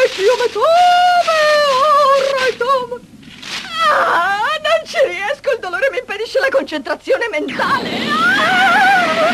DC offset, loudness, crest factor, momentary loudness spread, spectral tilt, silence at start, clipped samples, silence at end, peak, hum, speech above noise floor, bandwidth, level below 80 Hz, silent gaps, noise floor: under 0.1%; -14 LUFS; 12 dB; 10 LU; -2.5 dB/octave; 0 s; under 0.1%; 0 s; -2 dBFS; none; 22 dB; 14 kHz; -54 dBFS; none; -36 dBFS